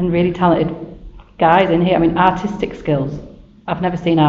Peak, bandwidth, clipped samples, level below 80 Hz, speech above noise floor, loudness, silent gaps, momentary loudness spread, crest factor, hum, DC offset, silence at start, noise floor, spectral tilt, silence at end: 0 dBFS; 7 kHz; under 0.1%; -40 dBFS; 21 dB; -16 LUFS; none; 15 LU; 16 dB; none; under 0.1%; 0 s; -36 dBFS; -5.5 dB/octave; 0 s